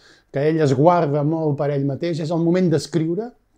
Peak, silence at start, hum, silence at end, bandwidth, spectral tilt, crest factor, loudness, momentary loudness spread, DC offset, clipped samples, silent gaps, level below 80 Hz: 0 dBFS; 0.35 s; none; 0.3 s; 10.5 kHz; -7.5 dB/octave; 18 dB; -20 LUFS; 8 LU; under 0.1%; under 0.1%; none; -60 dBFS